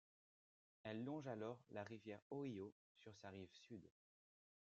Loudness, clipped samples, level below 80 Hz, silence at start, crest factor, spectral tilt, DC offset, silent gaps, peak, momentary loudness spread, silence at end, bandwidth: -54 LUFS; under 0.1%; under -90 dBFS; 0.85 s; 18 dB; -6 dB/octave; under 0.1%; 2.22-2.30 s, 2.72-2.95 s; -36 dBFS; 11 LU; 0.75 s; 8 kHz